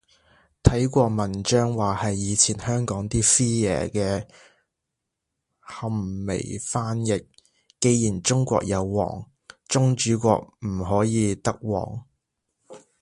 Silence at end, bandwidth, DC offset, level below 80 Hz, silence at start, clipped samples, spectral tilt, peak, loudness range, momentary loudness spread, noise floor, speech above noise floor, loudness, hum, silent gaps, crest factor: 0.25 s; 11.5 kHz; under 0.1%; -42 dBFS; 0.65 s; under 0.1%; -5 dB/octave; 0 dBFS; 9 LU; 10 LU; -82 dBFS; 59 dB; -23 LUFS; none; none; 24 dB